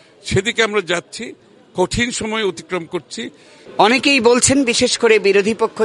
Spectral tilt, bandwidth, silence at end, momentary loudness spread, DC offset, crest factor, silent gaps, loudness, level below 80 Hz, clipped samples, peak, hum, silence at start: -3 dB/octave; 11.5 kHz; 0 s; 17 LU; under 0.1%; 16 dB; none; -15 LUFS; -44 dBFS; under 0.1%; 0 dBFS; none; 0.25 s